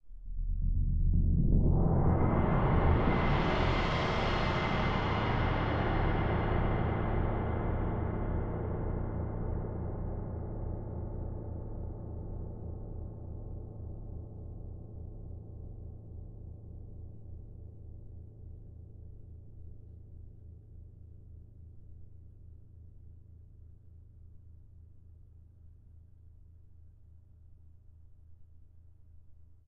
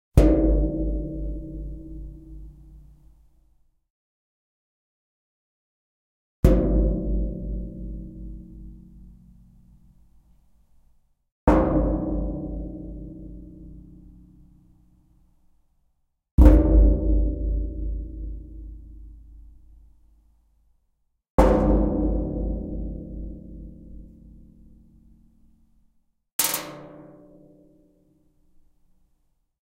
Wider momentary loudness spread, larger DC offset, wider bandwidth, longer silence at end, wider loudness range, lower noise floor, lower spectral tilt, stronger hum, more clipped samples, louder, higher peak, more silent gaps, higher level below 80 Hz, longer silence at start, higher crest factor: about the same, 25 LU vs 26 LU; neither; second, 6.8 kHz vs 16 kHz; second, 0.15 s vs 2.6 s; first, 24 LU vs 21 LU; second, -56 dBFS vs -71 dBFS; about the same, -8 dB/octave vs -7 dB/octave; neither; neither; second, -33 LUFS vs -24 LUFS; second, -14 dBFS vs -2 dBFS; second, none vs 3.90-6.43 s, 11.32-11.47 s, 16.31-16.38 s, 21.30-21.38 s, 26.33-26.39 s; second, -38 dBFS vs -28 dBFS; about the same, 0.05 s vs 0.15 s; about the same, 20 dB vs 24 dB